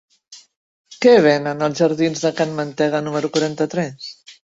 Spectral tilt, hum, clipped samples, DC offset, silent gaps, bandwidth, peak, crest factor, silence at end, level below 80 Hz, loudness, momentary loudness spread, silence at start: -5.5 dB/octave; none; under 0.1%; under 0.1%; 0.56-0.84 s; 7.8 kHz; -2 dBFS; 18 dB; 0.25 s; -62 dBFS; -18 LUFS; 11 LU; 0.3 s